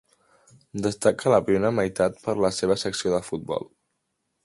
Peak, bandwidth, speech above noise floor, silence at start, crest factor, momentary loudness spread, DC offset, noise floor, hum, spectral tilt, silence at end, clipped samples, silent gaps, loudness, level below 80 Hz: -6 dBFS; 11.5 kHz; 53 dB; 0.75 s; 20 dB; 11 LU; under 0.1%; -77 dBFS; none; -5 dB/octave; 0.8 s; under 0.1%; none; -24 LUFS; -56 dBFS